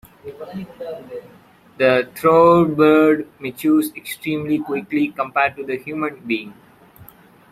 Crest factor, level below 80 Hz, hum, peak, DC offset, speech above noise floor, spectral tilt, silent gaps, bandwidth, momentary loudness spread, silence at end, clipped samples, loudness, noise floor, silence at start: 18 dB; -58 dBFS; none; -2 dBFS; under 0.1%; 28 dB; -6.5 dB/octave; none; 15.5 kHz; 20 LU; 1 s; under 0.1%; -18 LUFS; -46 dBFS; 0.25 s